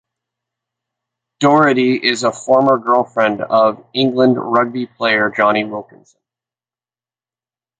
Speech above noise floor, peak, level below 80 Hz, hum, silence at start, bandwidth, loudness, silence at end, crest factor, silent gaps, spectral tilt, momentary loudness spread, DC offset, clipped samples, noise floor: over 75 dB; -2 dBFS; -62 dBFS; none; 1.4 s; 9.4 kHz; -14 LUFS; 2 s; 16 dB; none; -5 dB/octave; 7 LU; under 0.1%; under 0.1%; under -90 dBFS